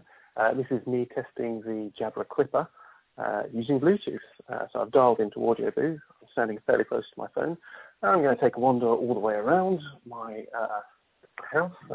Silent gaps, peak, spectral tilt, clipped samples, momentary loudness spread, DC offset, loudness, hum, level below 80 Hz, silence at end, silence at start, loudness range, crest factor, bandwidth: none; -8 dBFS; -10.5 dB/octave; under 0.1%; 15 LU; under 0.1%; -27 LUFS; none; -68 dBFS; 0 s; 0.35 s; 4 LU; 20 dB; 4 kHz